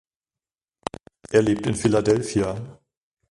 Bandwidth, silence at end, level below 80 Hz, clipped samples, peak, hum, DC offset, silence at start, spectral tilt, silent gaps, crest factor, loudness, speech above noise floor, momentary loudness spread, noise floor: 11.5 kHz; 0.6 s; -50 dBFS; under 0.1%; -4 dBFS; none; under 0.1%; 1.3 s; -6 dB/octave; none; 20 dB; -22 LUFS; over 69 dB; 16 LU; under -90 dBFS